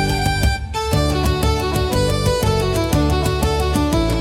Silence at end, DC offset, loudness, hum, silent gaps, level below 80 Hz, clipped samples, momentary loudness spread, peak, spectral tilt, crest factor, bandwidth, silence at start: 0 s; under 0.1%; -18 LUFS; none; none; -24 dBFS; under 0.1%; 2 LU; -6 dBFS; -5.5 dB/octave; 12 dB; 17 kHz; 0 s